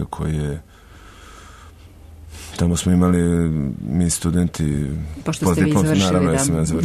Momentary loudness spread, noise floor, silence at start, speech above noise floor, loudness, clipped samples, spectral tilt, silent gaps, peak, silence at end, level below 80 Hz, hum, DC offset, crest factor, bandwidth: 10 LU; -43 dBFS; 0 s; 25 dB; -19 LUFS; under 0.1%; -6 dB/octave; none; -6 dBFS; 0 s; -36 dBFS; none; under 0.1%; 14 dB; 13.5 kHz